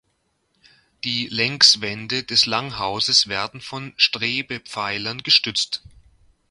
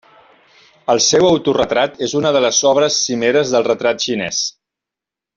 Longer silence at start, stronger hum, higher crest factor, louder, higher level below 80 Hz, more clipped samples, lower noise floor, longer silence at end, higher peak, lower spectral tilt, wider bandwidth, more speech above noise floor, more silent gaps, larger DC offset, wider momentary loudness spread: first, 1.05 s vs 0.9 s; neither; first, 22 dB vs 14 dB; second, -19 LUFS vs -15 LUFS; about the same, -58 dBFS vs -54 dBFS; neither; second, -69 dBFS vs -86 dBFS; second, 0.7 s vs 0.85 s; about the same, 0 dBFS vs -2 dBFS; second, -1.5 dB/octave vs -3 dB/octave; first, 11.5 kHz vs 7.6 kHz; second, 48 dB vs 71 dB; neither; neither; first, 16 LU vs 6 LU